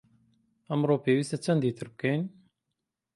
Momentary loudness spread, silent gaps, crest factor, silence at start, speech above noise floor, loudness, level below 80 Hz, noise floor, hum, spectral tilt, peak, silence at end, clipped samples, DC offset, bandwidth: 7 LU; none; 18 dB; 0.7 s; 57 dB; -29 LUFS; -72 dBFS; -85 dBFS; none; -7 dB/octave; -12 dBFS; 0.85 s; under 0.1%; under 0.1%; 11.5 kHz